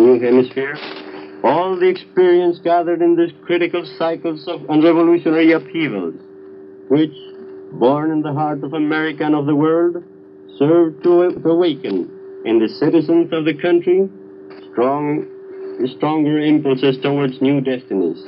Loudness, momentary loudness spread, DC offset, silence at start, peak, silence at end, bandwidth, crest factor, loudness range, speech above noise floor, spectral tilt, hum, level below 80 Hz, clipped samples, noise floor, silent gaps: -16 LUFS; 13 LU; under 0.1%; 0 s; -2 dBFS; 0 s; 5.6 kHz; 14 dB; 3 LU; 22 dB; -10.5 dB/octave; none; -72 dBFS; under 0.1%; -37 dBFS; none